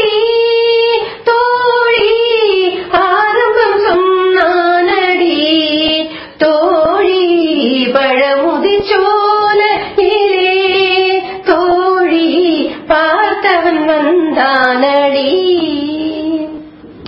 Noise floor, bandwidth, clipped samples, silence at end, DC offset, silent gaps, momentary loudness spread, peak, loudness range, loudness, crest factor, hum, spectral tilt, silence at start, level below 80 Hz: -31 dBFS; 5.8 kHz; under 0.1%; 0 s; under 0.1%; none; 4 LU; 0 dBFS; 1 LU; -11 LUFS; 10 dB; none; -6.5 dB/octave; 0 s; -46 dBFS